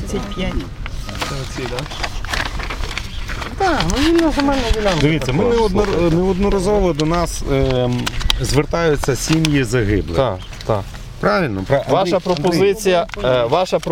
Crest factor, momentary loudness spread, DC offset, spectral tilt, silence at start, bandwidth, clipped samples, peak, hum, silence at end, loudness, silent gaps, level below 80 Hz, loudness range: 18 dB; 10 LU; under 0.1%; -5.5 dB/octave; 0 s; 16.5 kHz; under 0.1%; 0 dBFS; none; 0 s; -18 LUFS; none; -26 dBFS; 5 LU